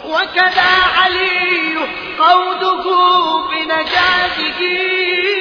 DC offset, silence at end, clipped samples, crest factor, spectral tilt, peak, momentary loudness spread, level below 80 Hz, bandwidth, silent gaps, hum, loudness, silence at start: under 0.1%; 0 s; under 0.1%; 14 dB; -3.5 dB/octave; 0 dBFS; 6 LU; -46 dBFS; 5.4 kHz; none; none; -13 LUFS; 0 s